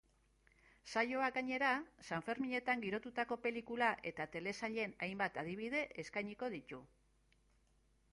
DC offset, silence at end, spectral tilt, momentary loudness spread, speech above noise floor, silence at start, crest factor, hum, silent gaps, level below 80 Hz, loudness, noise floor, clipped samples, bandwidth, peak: under 0.1%; 1.25 s; -5 dB/octave; 8 LU; 34 dB; 0.85 s; 22 dB; none; none; -74 dBFS; -40 LUFS; -74 dBFS; under 0.1%; 11.5 kHz; -20 dBFS